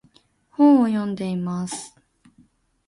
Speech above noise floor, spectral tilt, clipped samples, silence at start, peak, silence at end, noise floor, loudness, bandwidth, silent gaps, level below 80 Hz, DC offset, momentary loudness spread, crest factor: 39 dB; -6.5 dB/octave; under 0.1%; 0.6 s; -6 dBFS; 1 s; -59 dBFS; -20 LUFS; 11.5 kHz; none; -64 dBFS; under 0.1%; 20 LU; 18 dB